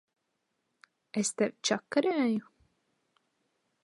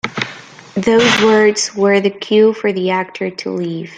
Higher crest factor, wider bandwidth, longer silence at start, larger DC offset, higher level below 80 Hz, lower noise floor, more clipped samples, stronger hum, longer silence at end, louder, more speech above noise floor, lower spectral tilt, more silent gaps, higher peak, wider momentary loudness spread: first, 22 dB vs 14 dB; first, 11.5 kHz vs 9.4 kHz; first, 1.15 s vs 0.05 s; neither; second, -80 dBFS vs -56 dBFS; first, -81 dBFS vs -35 dBFS; neither; neither; first, 1.4 s vs 0 s; second, -31 LUFS vs -14 LUFS; first, 51 dB vs 21 dB; about the same, -3.5 dB/octave vs -4 dB/octave; neither; second, -12 dBFS vs 0 dBFS; second, 6 LU vs 12 LU